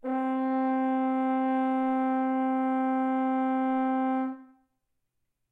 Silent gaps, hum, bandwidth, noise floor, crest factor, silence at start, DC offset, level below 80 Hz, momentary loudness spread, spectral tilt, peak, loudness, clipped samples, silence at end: none; none; 3.9 kHz; -79 dBFS; 10 dB; 0.05 s; under 0.1%; -82 dBFS; 2 LU; -7 dB/octave; -18 dBFS; -28 LUFS; under 0.1%; 1.05 s